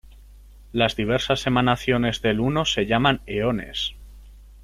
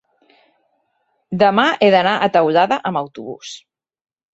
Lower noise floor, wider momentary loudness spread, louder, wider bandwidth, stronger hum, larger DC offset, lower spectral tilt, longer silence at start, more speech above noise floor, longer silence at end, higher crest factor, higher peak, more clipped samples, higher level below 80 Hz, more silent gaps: second, -46 dBFS vs -67 dBFS; second, 7 LU vs 18 LU; second, -22 LUFS vs -15 LUFS; first, 14.5 kHz vs 8 kHz; first, 50 Hz at -40 dBFS vs none; neither; about the same, -5 dB/octave vs -5.5 dB/octave; second, 0.1 s vs 1.3 s; second, 24 dB vs 52 dB; second, 0 s vs 0.75 s; about the same, 18 dB vs 16 dB; about the same, -4 dBFS vs -2 dBFS; neither; first, -42 dBFS vs -62 dBFS; neither